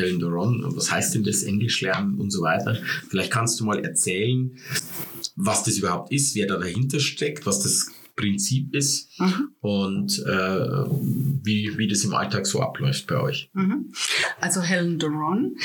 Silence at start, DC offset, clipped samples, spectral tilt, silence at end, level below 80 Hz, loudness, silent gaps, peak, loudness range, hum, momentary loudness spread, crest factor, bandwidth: 0 s; under 0.1%; under 0.1%; -4 dB/octave; 0 s; -66 dBFS; -24 LUFS; none; -6 dBFS; 1 LU; none; 5 LU; 18 dB; 19 kHz